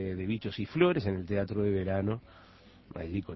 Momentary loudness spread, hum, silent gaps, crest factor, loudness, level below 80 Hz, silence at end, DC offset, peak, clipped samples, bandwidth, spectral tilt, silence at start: 12 LU; none; none; 20 dB; -32 LUFS; -50 dBFS; 0 s; under 0.1%; -12 dBFS; under 0.1%; 6 kHz; -9.5 dB/octave; 0 s